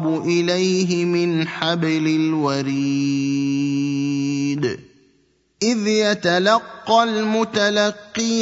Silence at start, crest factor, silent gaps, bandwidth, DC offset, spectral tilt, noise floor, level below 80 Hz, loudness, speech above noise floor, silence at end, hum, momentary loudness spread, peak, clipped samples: 0 s; 18 dB; none; 8 kHz; under 0.1%; -5 dB/octave; -61 dBFS; -64 dBFS; -19 LUFS; 42 dB; 0 s; none; 4 LU; -2 dBFS; under 0.1%